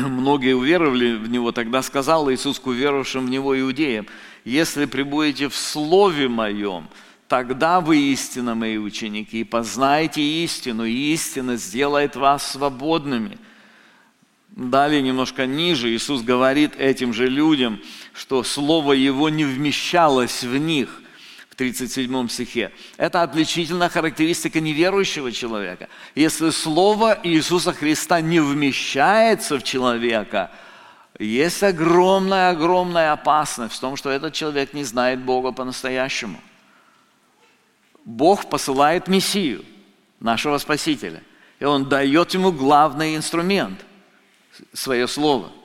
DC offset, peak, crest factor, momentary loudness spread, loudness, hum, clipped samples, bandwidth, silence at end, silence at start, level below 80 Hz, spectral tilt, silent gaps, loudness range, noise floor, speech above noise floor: under 0.1%; -2 dBFS; 18 dB; 10 LU; -20 LUFS; none; under 0.1%; 17 kHz; 0.1 s; 0 s; -52 dBFS; -4 dB/octave; none; 4 LU; -59 dBFS; 39 dB